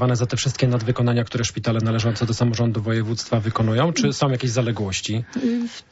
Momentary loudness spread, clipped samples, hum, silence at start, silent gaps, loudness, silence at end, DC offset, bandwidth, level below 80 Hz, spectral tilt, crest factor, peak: 4 LU; under 0.1%; none; 0 s; none; -22 LUFS; 0.1 s; under 0.1%; 8 kHz; -50 dBFS; -5.5 dB/octave; 14 dB; -6 dBFS